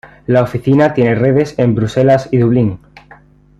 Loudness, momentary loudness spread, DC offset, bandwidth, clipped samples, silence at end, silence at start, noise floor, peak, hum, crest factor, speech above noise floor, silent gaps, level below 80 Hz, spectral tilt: -13 LUFS; 4 LU; under 0.1%; 8.8 kHz; under 0.1%; 0.85 s; 0.05 s; -43 dBFS; -2 dBFS; 50 Hz at -40 dBFS; 12 dB; 31 dB; none; -42 dBFS; -8.5 dB/octave